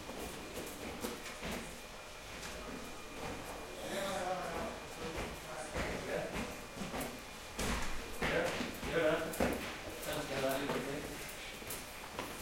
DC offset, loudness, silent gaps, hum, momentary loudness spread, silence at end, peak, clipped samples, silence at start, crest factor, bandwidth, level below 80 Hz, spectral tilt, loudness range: under 0.1%; -40 LUFS; none; none; 10 LU; 0 s; -18 dBFS; under 0.1%; 0 s; 22 dB; 16.5 kHz; -52 dBFS; -3.5 dB/octave; 7 LU